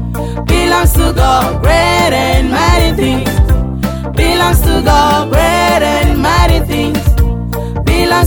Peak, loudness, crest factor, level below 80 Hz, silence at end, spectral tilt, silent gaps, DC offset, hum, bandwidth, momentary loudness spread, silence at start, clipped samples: 0 dBFS; -11 LUFS; 10 dB; -14 dBFS; 0 s; -5 dB/octave; none; under 0.1%; none; over 20 kHz; 6 LU; 0 s; under 0.1%